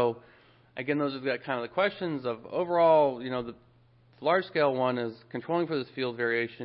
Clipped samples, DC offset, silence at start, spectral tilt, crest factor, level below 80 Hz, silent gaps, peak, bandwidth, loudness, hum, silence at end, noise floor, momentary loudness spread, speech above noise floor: under 0.1%; under 0.1%; 0 s; -9.5 dB/octave; 18 dB; -70 dBFS; none; -12 dBFS; 5.4 kHz; -29 LUFS; none; 0 s; -61 dBFS; 12 LU; 32 dB